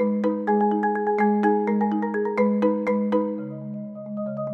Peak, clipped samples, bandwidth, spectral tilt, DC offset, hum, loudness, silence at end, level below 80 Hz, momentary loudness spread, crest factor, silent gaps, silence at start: -8 dBFS; under 0.1%; 4.4 kHz; -9.5 dB/octave; under 0.1%; none; -23 LUFS; 0 s; -68 dBFS; 12 LU; 14 dB; none; 0 s